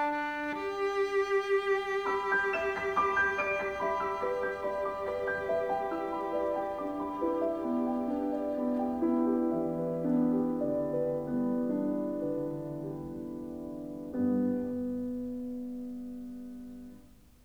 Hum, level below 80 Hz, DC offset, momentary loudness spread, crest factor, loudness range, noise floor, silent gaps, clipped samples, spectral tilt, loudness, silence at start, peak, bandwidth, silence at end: none; -62 dBFS; under 0.1%; 12 LU; 16 dB; 6 LU; -56 dBFS; none; under 0.1%; -6.5 dB/octave; -32 LUFS; 0 s; -16 dBFS; over 20 kHz; 0.3 s